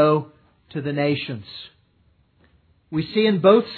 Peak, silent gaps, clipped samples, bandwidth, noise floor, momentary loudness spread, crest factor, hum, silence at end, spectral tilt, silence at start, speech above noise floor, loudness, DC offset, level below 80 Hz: -4 dBFS; none; under 0.1%; 4.6 kHz; -61 dBFS; 22 LU; 18 dB; none; 0 s; -9.5 dB/octave; 0 s; 41 dB; -21 LUFS; under 0.1%; -62 dBFS